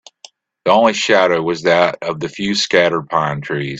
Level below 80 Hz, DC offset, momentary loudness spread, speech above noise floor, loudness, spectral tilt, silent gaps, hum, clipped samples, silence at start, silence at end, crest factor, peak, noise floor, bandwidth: -56 dBFS; under 0.1%; 9 LU; 30 dB; -15 LUFS; -4 dB/octave; none; none; under 0.1%; 0.65 s; 0 s; 16 dB; 0 dBFS; -45 dBFS; 8.4 kHz